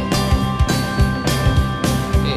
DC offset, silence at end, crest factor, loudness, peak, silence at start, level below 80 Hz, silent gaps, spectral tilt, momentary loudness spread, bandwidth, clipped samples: under 0.1%; 0 s; 12 dB; -18 LUFS; -6 dBFS; 0 s; -22 dBFS; none; -5.5 dB/octave; 1 LU; 15.5 kHz; under 0.1%